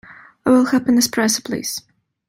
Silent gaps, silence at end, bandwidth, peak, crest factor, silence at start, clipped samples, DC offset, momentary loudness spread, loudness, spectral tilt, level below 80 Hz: none; 0.5 s; 16.5 kHz; -4 dBFS; 16 dB; 0.1 s; under 0.1%; under 0.1%; 11 LU; -17 LUFS; -3 dB/octave; -60 dBFS